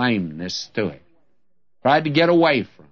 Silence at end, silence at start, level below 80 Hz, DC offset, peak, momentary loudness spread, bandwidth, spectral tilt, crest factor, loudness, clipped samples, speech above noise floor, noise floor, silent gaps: 0.25 s; 0 s; -62 dBFS; 0.2%; -4 dBFS; 12 LU; 7 kHz; -5.5 dB/octave; 16 dB; -20 LUFS; under 0.1%; 56 dB; -75 dBFS; none